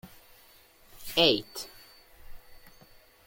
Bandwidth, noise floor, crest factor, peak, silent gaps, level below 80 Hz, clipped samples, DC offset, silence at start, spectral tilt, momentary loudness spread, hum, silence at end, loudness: 17 kHz; -58 dBFS; 26 dB; -8 dBFS; none; -56 dBFS; under 0.1%; under 0.1%; 0.05 s; -3.5 dB/octave; 21 LU; none; 0.6 s; -26 LUFS